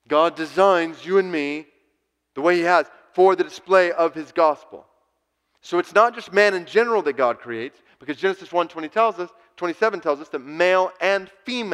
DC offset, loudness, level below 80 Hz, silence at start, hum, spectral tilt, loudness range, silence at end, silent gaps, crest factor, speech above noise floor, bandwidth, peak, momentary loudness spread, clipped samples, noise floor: under 0.1%; -21 LUFS; -72 dBFS; 0.1 s; none; -4.5 dB/octave; 3 LU; 0 s; none; 20 dB; 52 dB; 11.5 kHz; -2 dBFS; 13 LU; under 0.1%; -72 dBFS